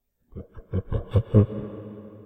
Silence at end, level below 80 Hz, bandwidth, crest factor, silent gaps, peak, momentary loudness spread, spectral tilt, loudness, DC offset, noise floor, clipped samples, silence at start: 0.05 s; -40 dBFS; 3.8 kHz; 20 dB; none; -4 dBFS; 22 LU; -11.5 dB/octave; -25 LUFS; under 0.1%; -44 dBFS; under 0.1%; 0.35 s